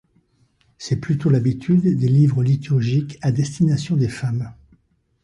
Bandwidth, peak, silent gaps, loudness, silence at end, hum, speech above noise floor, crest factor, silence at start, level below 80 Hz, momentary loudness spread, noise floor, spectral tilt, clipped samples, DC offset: 11 kHz; -6 dBFS; none; -19 LUFS; 0.7 s; none; 43 dB; 14 dB; 0.8 s; -50 dBFS; 9 LU; -61 dBFS; -8 dB/octave; under 0.1%; under 0.1%